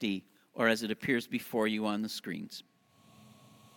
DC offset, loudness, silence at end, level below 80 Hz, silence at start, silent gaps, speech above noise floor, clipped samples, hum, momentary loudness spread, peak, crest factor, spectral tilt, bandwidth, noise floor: under 0.1%; -33 LUFS; 0.5 s; -74 dBFS; 0 s; none; 30 dB; under 0.1%; none; 14 LU; -12 dBFS; 22 dB; -4.5 dB/octave; 17.5 kHz; -63 dBFS